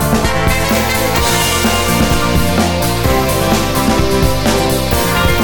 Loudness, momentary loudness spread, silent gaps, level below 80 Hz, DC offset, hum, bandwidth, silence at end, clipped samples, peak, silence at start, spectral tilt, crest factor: -13 LUFS; 2 LU; none; -22 dBFS; under 0.1%; none; 17.5 kHz; 0 s; under 0.1%; 0 dBFS; 0 s; -4 dB/octave; 12 dB